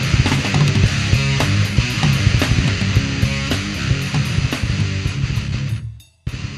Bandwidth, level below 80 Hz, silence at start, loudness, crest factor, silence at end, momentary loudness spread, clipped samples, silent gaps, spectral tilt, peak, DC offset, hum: 14 kHz; -28 dBFS; 0 s; -18 LUFS; 16 dB; 0 s; 8 LU; under 0.1%; none; -5 dB/octave; -2 dBFS; under 0.1%; none